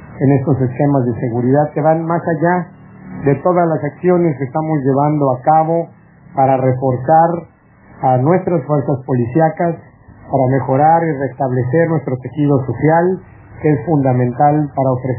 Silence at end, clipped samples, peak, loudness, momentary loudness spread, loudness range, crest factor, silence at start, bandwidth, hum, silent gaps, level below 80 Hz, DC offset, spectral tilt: 0 s; under 0.1%; 0 dBFS; -15 LUFS; 7 LU; 1 LU; 14 dB; 0 s; 3.1 kHz; none; none; -48 dBFS; under 0.1%; -13.5 dB/octave